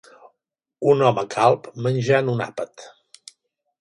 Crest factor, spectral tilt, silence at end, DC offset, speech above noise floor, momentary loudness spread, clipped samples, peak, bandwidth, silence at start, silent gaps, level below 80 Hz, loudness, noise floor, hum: 20 dB; -6.5 dB/octave; 0.9 s; under 0.1%; 61 dB; 12 LU; under 0.1%; -2 dBFS; 11 kHz; 0.8 s; none; -66 dBFS; -20 LUFS; -81 dBFS; none